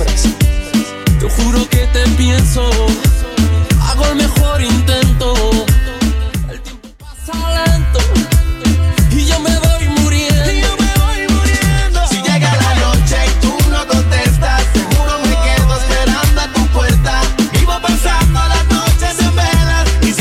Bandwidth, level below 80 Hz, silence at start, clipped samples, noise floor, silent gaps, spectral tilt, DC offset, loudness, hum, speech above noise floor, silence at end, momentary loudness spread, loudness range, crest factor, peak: 16 kHz; -14 dBFS; 0 s; under 0.1%; -31 dBFS; none; -5 dB/octave; under 0.1%; -13 LUFS; none; 21 dB; 0 s; 3 LU; 2 LU; 12 dB; 0 dBFS